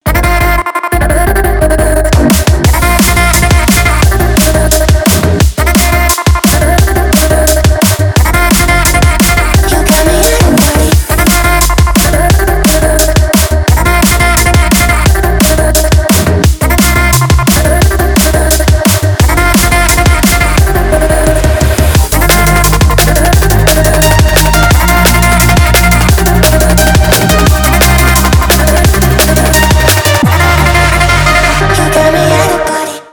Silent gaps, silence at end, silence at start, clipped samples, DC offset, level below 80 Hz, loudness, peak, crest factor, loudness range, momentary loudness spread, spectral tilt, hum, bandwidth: none; 0.1 s; 0.05 s; 0.4%; under 0.1%; -10 dBFS; -7 LUFS; 0 dBFS; 6 dB; 1 LU; 2 LU; -4.5 dB/octave; none; over 20 kHz